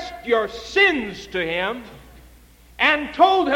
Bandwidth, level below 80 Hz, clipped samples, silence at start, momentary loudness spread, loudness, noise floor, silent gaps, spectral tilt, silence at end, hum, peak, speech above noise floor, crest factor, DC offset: 16.5 kHz; -48 dBFS; under 0.1%; 0 s; 10 LU; -20 LUFS; -49 dBFS; none; -4 dB/octave; 0 s; none; -4 dBFS; 29 dB; 18 dB; under 0.1%